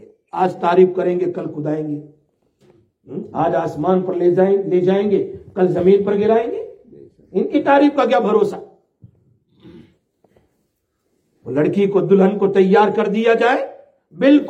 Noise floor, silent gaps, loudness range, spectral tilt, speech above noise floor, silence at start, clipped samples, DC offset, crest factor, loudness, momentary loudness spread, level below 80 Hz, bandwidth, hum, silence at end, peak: -69 dBFS; none; 6 LU; -8 dB/octave; 54 dB; 0.35 s; under 0.1%; under 0.1%; 16 dB; -16 LUFS; 13 LU; -62 dBFS; 7.8 kHz; none; 0 s; -2 dBFS